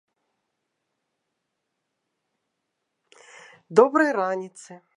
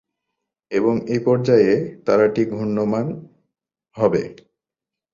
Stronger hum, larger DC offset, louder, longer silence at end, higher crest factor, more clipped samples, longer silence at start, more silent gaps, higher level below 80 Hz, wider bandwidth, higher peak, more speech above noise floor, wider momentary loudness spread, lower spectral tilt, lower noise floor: neither; neither; about the same, -21 LUFS vs -19 LUFS; second, 0.2 s vs 0.8 s; first, 26 dB vs 18 dB; neither; first, 3.7 s vs 0.7 s; neither; second, -86 dBFS vs -58 dBFS; first, 10.5 kHz vs 7.4 kHz; about the same, -2 dBFS vs -4 dBFS; second, 58 dB vs 69 dB; first, 14 LU vs 10 LU; second, -5.5 dB/octave vs -8 dB/octave; second, -80 dBFS vs -87 dBFS